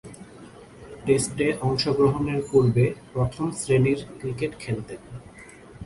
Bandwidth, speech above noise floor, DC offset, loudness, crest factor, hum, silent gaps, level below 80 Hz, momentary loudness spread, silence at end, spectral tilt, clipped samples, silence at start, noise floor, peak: 11.5 kHz; 23 dB; under 0.1%; -24 LUFS; 18 dB; none; none; -50 dBFS; 23 LU; 0 s; -6 dB/octave; under 0.1%; 0.05 s; -46 dBFS; -6 dBFS